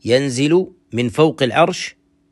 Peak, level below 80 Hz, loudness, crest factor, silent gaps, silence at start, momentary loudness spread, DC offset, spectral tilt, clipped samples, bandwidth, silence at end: -2 dBFS; -56 dBFS; -17 LUFS; 16 dB; none; 0.05 s; 10 LU; under 0.1%; -5.5 dB/octave; under 0.1%; 12 kHz; 0.4 s